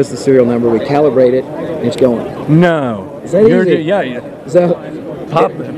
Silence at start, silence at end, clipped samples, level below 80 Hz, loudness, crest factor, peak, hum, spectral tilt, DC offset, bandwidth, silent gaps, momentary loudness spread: 0 s; 0 s; 0.6%; -48 dBFS; -12 LUFS; 12 dB; 0 dBFS; none; -7.5 dB/octave; under 0.1%; 12.5 kHz; none; 11 LU